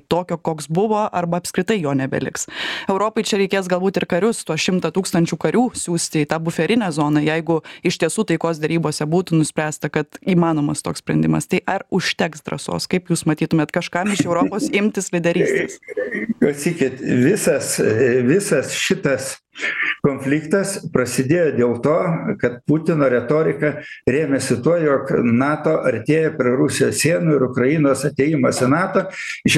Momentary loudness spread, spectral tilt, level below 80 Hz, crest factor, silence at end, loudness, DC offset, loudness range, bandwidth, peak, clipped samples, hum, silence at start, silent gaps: 6 LU; -5 dB/octave; -54 dBFS; 16 dB; 0 s; -19 LUFS; under 0.1%; 3 LU; 15 kHz; -2 dBFS; under 0.1%; none; 0.1 s; none